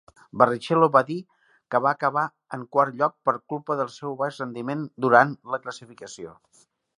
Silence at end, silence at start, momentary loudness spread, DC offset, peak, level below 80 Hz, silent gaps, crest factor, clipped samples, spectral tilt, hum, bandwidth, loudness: 0.65 s; 0.35 s; 20 LU; under 0.1%; -2 dBFS; -72 dBFS; none; 24 dB; under 0.1%; -6 dB/octave; none; 11 kHz; -24 LUFS